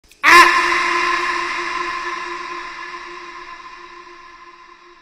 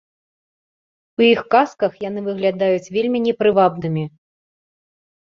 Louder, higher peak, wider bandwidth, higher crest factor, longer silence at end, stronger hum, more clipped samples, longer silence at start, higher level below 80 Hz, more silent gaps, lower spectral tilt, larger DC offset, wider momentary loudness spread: first, -14 LUFS vs -18 LUFS; about the same, 0 dBFS vs -2 dBFS; first, 16 kHz vs 7.4 kHz; about the same, 18 dB vs 18 dB; second, 0.5 s vs 1.15 s; neither; neither; second, 0.25 s vs 1.2 s; first, -50 dBFS vs -62 dBFS; neither; second, -0.5 dB/octave vs -6.5 dB/octave; neither; first, 26 LU vs 10 LU